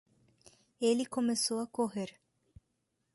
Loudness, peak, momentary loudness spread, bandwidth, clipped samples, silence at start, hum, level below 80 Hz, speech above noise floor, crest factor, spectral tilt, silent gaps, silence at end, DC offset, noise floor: -33 LUFS; -18 dBFS; 8 LU; 12 kHz; under 0.1%; 0.8 s; none; -74 dBFS; 48 dB; 18 dB; -3.5 dB/octave; none; 1.05 s; under 0.1%; -81 dBFS